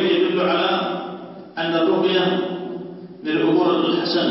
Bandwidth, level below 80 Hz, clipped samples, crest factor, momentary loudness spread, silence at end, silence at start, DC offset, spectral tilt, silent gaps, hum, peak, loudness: 5.8 kHz; -68 dBFS; under 0.1%; 14 dB; 15 LU; 0 s; 0 s; under 0.1%; -9 dB/octave; none; none; -6 dBFS; -20 LUFS